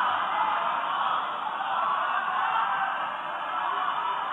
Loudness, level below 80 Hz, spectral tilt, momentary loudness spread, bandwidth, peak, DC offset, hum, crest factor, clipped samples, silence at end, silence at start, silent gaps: -27 LUFS; -82 dBFS; -3.5 dB/octave; 5 LU; 11 kHz; -14 dBFS; under 0.1%; none; 14 dB; under 0.1%; 0 s; 0 s; none